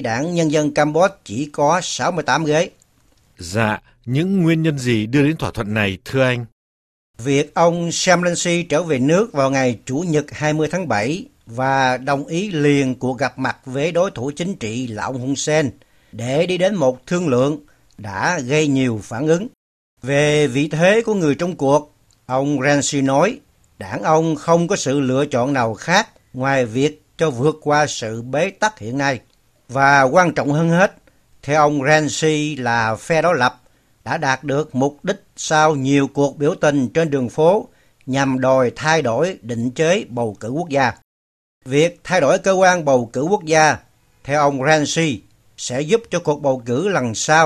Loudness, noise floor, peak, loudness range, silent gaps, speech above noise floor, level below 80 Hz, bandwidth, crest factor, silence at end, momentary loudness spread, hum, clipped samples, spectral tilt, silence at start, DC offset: -18 LUFS; -56 dBFS; 0 dBFS; 3 LU; 6.52-7.14 s, 19.57-19.97 s, 41.04-41.61 s; 39 dB; -52 dBFS; 13.5 kHz; 18 dB; 0 s; 9 LU; none; under 0.1%; -5 dB/octave; 0 s; under 0.1%